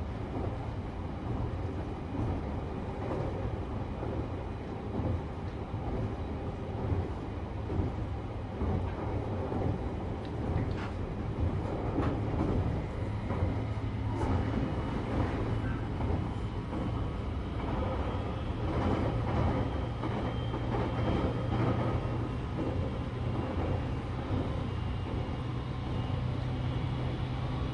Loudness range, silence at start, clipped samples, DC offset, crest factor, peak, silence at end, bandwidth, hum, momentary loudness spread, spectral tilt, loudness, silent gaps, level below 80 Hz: 4 LU; 0 s; under 0.1%; under 0.1%; 16 dB; -18 dBFS; 0 s; 9.6 kHz; none; 6 LU; -8.5 dB/octave; -34 LUFS; none; -40 dBFS